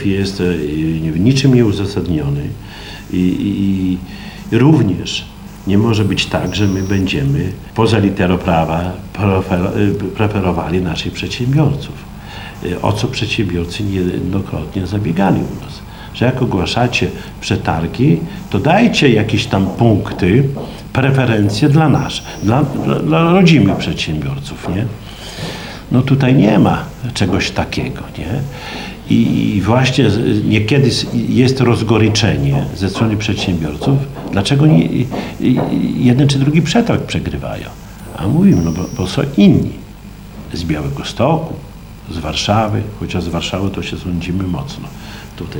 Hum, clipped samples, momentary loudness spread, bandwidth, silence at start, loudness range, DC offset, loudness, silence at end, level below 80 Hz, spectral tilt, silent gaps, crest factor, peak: none; under 0.1%; 14 LU; 18.5 kHz; 0 s; 5 LU; under 0.1%; -15 LUFS; 0 s; -36 dBFS; -6.5 dB/octave; none; 14 dB; 0 dBFS